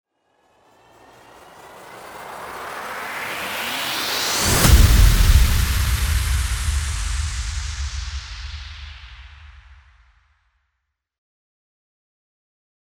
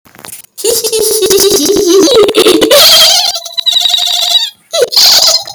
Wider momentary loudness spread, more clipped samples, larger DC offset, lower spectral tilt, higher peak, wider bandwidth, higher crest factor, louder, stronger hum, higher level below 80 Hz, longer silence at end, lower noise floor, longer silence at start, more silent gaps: first, 23 LU vs 9 LU; second, under 0.1% vs 1%; neither; first, -3.5 dB/octave vs -0.5 dB/octave; about the same, -2 dBFS vs 0 dBFS; about the same, over 20 kHz vs over 20 kHz; first, 20 dB vs 8 dB; second, -20 LUFS vs -5 LUFS; neither; first, -24 dBFS vs -44 dBFS; first, 3.35 s vs 0 s; first, -77 dBFS vs -30 dBFS; first, 1.65 s vs 0.3 s; neither